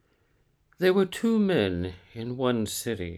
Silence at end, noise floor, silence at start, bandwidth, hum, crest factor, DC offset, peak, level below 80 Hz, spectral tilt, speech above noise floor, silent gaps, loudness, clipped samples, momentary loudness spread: 0 s; -67 dBFS; 0.8 s; 15.5 kHz; none; 18 dB; under 0.1%; -10 dBFS; -56 dBFS; -5.5 dB/octave; 41 dB; none; -26 LUFS; under 0.1%; 12 LU